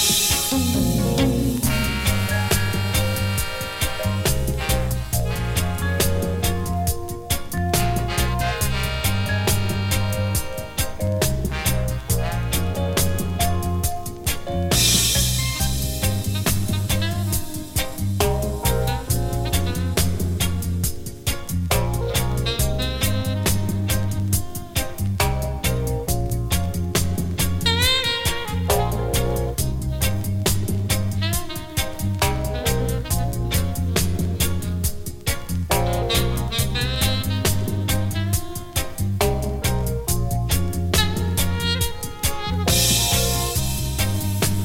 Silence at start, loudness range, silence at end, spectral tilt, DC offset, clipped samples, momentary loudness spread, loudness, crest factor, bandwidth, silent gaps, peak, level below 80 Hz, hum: 0 s; 3 LU; 0 s; -4 dB/octave; under 0.1%; under 0.1%; 6 LU; -22 LUFS; 18 dB; 17 kHz; none; -4 dBFS; -30 dBFS; none